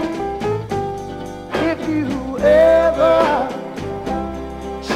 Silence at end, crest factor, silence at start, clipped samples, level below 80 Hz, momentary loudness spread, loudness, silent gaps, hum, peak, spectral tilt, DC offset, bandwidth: 0 s; 18 dB; 0 s; under 0.1%; -38 dBFS; 16 LU; -18 LUFS; none; none; 0 dBFS; -6 dB/octave; under 0.1%; 13 kHz